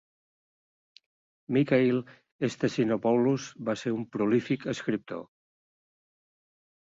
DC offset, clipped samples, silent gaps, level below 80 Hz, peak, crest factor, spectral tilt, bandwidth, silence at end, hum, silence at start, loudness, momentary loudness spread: under 0.1%; under 0.1%; 2.32-2.39 s; -70 dBFS; -12 dBFS; 18 dB; -6.5 dB/octave; 7.8 kHz; 1.7 s; none; 1.5 s; -28 LUFS; 9 LU